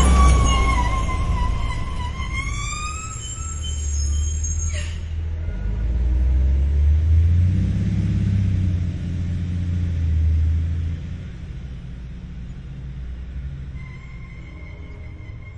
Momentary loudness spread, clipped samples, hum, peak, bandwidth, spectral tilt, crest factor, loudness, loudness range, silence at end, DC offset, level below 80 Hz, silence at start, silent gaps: 18 LU; under 0.1%; none; -4 dBFS; 11 kHz; -5.5 dB/octave; 18 dB; -22 LUFS; 14 LU; 0 s; under 0.1%; -24 dBFS; 0 s; none